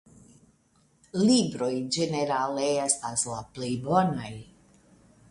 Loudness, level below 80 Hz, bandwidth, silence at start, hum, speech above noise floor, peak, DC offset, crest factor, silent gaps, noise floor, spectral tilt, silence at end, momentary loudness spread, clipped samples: -27 LUFS; -62 dBFS; 11.5 kHz; 1.15 s; none; 39 dB; -8 dBFS; under 0.1%; 20 dB; none; -65 dBFS; -4.5 dB/octave; 0.9 s; 13 LU; under 0.1%